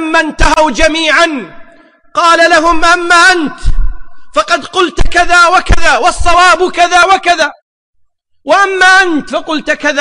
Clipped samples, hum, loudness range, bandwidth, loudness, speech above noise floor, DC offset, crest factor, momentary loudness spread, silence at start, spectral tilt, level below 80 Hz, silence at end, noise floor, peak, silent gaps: under 0.1%; none; 1 LU; 10.5 kHz; -8 LUFS; 48 dB; under 0.1%; 8 dB; 11 LU; 0 s; -3 dB/octave; -20 dBFS; 0 s; -55 dBFS; 0 dBFS; 7.62-7.93 s